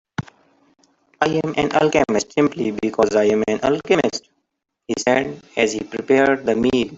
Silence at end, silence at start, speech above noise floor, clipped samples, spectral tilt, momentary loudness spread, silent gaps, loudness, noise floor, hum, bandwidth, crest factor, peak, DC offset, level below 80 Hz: 0 s; 0.2 s; 56 dB; under 0.1%; -5 dB/octave; 9 LU; none; -19 LUFS; -75 dBFS; none; 8 kHz; 18 dB; 0 dBFS; under 0.1%; -52 dBFS